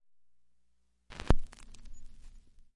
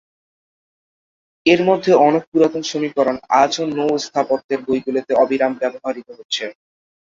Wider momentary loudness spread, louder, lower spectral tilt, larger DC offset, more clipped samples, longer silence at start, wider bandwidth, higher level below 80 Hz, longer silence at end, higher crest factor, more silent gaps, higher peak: first, 24 LU vs 10 LU; second, -35 LUFS vs -18 LUFS; first, -6.5 dB/octave vs -4.5 dB/octave; neither; neither; second, 1.1 s vs 1.45 s; first, 9.6 kHz vs 7.6 kHz; first, -38 dBFS vs -60 dBFS; about the same, 0.45 s vs 0.5 s; first, 28 dB vs 16 dB; second, none vs 2.27-2.32 s, 4.44-4.49 s, 6.25-6.29 s; second, -6 dBFS vs -2 dBFS